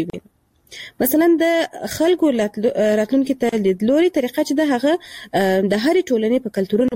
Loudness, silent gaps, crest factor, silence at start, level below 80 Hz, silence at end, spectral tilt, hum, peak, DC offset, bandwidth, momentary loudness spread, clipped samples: -18 LUFS; none; 12 dB; 0 s; -56 dBFS; 0 s; -5.5 dB/octave; none; -6 dBFS; under 0.1%; 16 kHz; 7 LU; under 0.1%